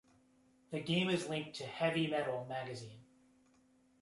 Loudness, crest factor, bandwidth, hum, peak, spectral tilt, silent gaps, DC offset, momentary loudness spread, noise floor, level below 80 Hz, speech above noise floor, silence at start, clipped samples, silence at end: -38 LUFS; 20 dB; 11.5 kHz; none; -20 dBFS; -5.5 dB/octave; none; under 0.1%; 12 LU; -70 dBFS; -76 dBFS; 33 dB; 0.7 s; under 0.1%; 1 s